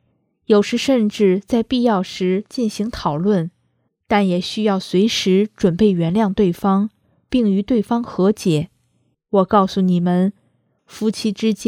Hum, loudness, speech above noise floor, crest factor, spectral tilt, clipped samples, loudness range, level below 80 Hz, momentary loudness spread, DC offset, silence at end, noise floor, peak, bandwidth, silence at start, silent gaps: none; -18 LUFS; 49 dB; 18 dB; -6.5 dB/octave; under 0.1%; 2 LU; -48 dBFS; 6 LU; under 0.1%; 0 s; -66 dBFS; 0 dBFS; 14 kHz; 0.5 s; none